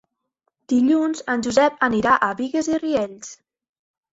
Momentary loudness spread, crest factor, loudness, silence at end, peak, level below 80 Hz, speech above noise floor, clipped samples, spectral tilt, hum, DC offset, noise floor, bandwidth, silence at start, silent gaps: 8 LU; 18 dB; -20 LUFS; 0.8 s; -2 dBFS; -58 dBFS; 55 dB; under 0.1%; -4.5 dB/octave; none; under 0.1%; -74 dBFS; 8 kHz; 0.7 s; none